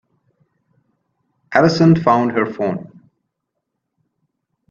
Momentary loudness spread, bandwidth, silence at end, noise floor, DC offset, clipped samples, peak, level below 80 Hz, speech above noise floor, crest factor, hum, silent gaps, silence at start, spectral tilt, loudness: 11 LU; 7.4 kHz; 1.85 s; -76 dBFS; under 0.1%; under 0.1%; 0 dBFS; -56 dBFS; 62 dB; 20 dB; none; none; 1.5 s; -7.5 dB/octave; -15 LUFS